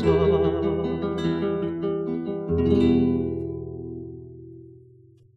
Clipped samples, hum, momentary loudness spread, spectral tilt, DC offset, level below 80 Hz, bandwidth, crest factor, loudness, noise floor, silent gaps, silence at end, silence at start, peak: under 0.1%; none; 19 LU; -9 dB/octave; under 0.1%; -42 dBFS; 7.8 kHz; 16 dB; -24 LUFS; -53 dBFS; none; 0.55 s; 0 s; -8 dBFS